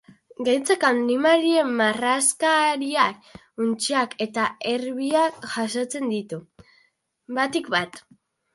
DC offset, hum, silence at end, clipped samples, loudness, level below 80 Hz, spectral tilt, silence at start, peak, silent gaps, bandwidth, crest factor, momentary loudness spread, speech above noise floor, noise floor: under 0.1%; none; 0.55 s; under 0.1%; -22 LUFS; -68 dBFS; -2.5 dB/octave; 0.4 s; -4 dBFS; none; 12 kHz; 18 dB; 10 LU; 43 dB; -66 dBFS